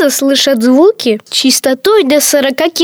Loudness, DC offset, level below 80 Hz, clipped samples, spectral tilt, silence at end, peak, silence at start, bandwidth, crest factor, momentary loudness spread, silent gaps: -9 LUFS; under 0.1%; -56 dBFS; under 0.1%; -2 dB/octave; 0 s; 0 dBFS; 0 s; over 20 kHz; 10 dB; 4 LU; none